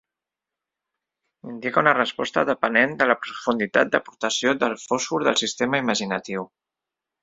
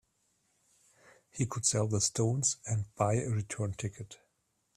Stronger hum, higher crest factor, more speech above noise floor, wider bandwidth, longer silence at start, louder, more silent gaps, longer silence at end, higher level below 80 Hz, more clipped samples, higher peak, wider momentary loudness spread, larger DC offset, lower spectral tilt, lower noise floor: neither; about the same, 22 dB vs 22 dB; first, 65 dB vs 46 dB; second, 8 kHz vs 13.5 kHz; about the same, 1.45 s vs 1.35 s; first, -22 LUFS vs -32 LUFS; neither; first, 0.75 s vs 0.6 s; about the same, -66 dBFS vs -64 dBFS; neither; first, -2 dBFS vs -12 dBFS; about the same, 9 LU vs 11 LU; neither; second, -3 dB/octave vs -4.5 dB/octave; first, -87 dBFS vs -78 dBFS